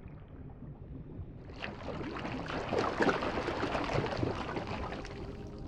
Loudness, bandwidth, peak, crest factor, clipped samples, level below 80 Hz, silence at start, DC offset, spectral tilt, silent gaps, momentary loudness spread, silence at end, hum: -36 LUFS; 11 kHz; -14 dBFS; 22 dB; under 0.1%; -50 dBFS; 0 s; under 0.1%; -6 dB/octave; none; 18 LU; 0 s; none